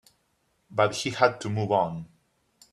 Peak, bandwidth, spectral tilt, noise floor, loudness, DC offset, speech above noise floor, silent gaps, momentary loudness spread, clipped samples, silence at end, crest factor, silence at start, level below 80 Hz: -6 dBFS; 12.5 kHz; -5 dB/octave; -71 dBFS; -26 LUFS; under 0.1%; 46 dB; none; 9 LU; under 0.1%; 0.65 s; 22 dB; 0.7 s; -66 dBFS